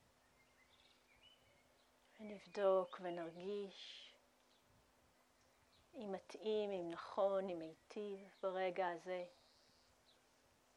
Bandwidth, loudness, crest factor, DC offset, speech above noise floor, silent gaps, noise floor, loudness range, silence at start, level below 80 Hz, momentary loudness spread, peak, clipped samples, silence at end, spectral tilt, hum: 11.5 kHz; -44 LUFS; 22 dB; under 0.1%; 31 dB; none; -75 dBFS; 7 LU; 1.25 s; -86 dBFS; 16 LU; -26 dBFS; under 0.1%; 1.45 s; -5.5 dB/octave; none